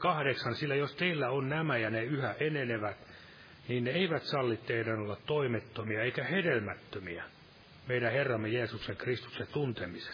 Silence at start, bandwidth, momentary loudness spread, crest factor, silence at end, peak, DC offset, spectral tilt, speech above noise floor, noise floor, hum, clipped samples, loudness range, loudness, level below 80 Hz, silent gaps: 0 s; 5.2 kHz; 12 LU; 18 dB; 0 s; -16 dBFS; under 0.1%; -7.5 dB/octave; 23 dB; -56 dBFS; none; under 0.1%; 2 LU; -34 LUFS; -68 dBFS; none